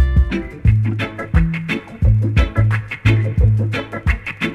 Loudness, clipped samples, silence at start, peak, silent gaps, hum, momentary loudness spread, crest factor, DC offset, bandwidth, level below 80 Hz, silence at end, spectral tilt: -18 LUFS; under 0.1%; 0 s; -2 dBFS; none; none; 6 LU; 14 dB; under 0.1%; 6.6 kHz; -22 dBFS; 0 s; -7.5 dB/octave